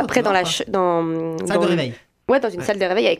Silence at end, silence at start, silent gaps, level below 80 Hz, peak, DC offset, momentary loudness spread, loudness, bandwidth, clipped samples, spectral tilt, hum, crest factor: 0 s; 0 s; none; -56 dBFS; 0 dBFS; under 0.1%; 6 LU; -20 LUFS; 15 kHz; under 0.1%; -4.5 dB/octave; none; 20 dB